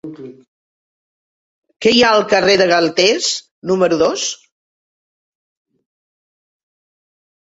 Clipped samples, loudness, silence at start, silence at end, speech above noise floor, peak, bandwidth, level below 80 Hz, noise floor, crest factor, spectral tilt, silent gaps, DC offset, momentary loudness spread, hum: under 0.1%; -14 LUFS; 0.05 s; 3.05 s; over 76 dB; 0 dBFS; 8 kHz; -56 dBFS; under -90 dBFS; 18 dB; -3 dB/octave; 0.47-1.62 s, 3.51-3.62 s; under 0.1%; 11 LU; none